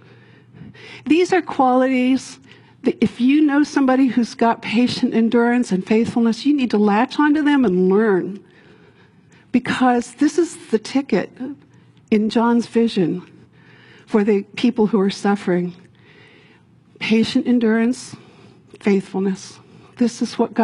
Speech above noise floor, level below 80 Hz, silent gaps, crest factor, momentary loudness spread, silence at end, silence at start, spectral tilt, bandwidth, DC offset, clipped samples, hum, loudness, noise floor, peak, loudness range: 34 dB; -60 dBFS; none; 16 dB; 9 LU; 0 s; 0.6 s; -6 dB/octave; 11.5 kHz; under 0.1%; under 0.1%; none; -18 LUFS; -51 dBFS; -4 dBFS; 4 LU